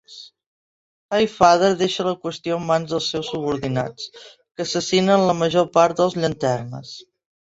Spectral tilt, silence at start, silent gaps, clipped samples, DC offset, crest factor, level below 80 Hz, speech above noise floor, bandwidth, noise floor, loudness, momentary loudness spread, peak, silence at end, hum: -5 dB/octave; 0.1 s; 0.46-1.09 s; under 0.1%; under 0.1%; 20 dB; -56 dBFS; over 70 dB; 8 kHz; under -90 dBFS; -20 LUFS; 19 LU; -2 dBFS; 0.55 s; none